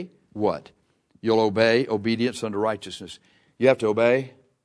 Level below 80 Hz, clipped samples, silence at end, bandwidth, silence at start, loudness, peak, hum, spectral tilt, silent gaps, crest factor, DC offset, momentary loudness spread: -66 dBFS; under 0.1%; 0.35 s; 11 kHz; 0 s; -23 LUFS; -4 dBFS; none; -5.5 dB/octave; none; 20 dB; under 0.1%; 17 LU